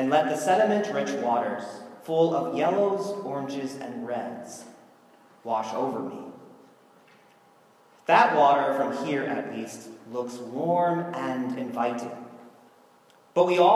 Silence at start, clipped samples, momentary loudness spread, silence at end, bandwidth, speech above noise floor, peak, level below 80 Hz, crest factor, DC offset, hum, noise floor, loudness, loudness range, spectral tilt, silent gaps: 0 s; under 0.1%; 19 LU; 0 s; 13.5 kHz; 33 dB; -4 dBFS; -84 dBFS; 22 dB; under 0.1%; none; -58 dBFS; -26 LUFS; 9 LU; -5.5 dB/octave; none